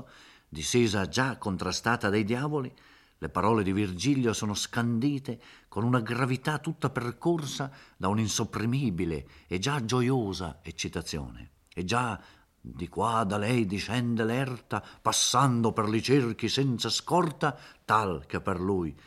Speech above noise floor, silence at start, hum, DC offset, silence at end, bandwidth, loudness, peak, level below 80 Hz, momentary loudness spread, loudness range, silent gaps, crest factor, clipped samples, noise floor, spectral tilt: 25 dB; 0 s; none; under 0.1%; 0.1 s; 14.5 kHz; -29 LUFS; -8 dBFS; -56 dBFS; 11 LU; 5 LU; none; 20 dB; under 0.1%; -54 dBFS; -5 dB/octave